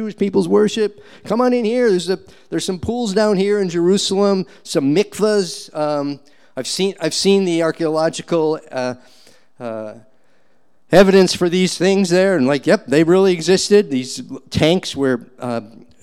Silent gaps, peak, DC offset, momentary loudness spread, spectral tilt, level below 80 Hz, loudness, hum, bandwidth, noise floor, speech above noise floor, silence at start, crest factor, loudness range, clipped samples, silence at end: none; -2 dBFS; 0.4%; 13 LU; -5 dB/octave; -50 dBFS; -17 LUFS; none; 14.5 kHz; -62 dBFS; 46 dB; 0 s; 16 dB; 5 LU; under 0.1%; 0.35 s